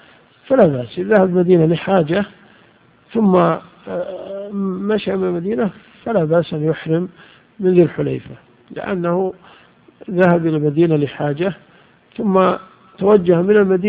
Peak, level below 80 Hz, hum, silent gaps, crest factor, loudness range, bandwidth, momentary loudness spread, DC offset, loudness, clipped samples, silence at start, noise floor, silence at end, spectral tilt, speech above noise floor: 0 dBFS; -54 dBFS; none; none; 16 dB; 4 LU; 4.8 kHz; 13 LU; under 0.1%; -17 LUFS; under 0.1%; 0.5 s; -51 dBFS; 0 s; -11 dB/octave; 35 dB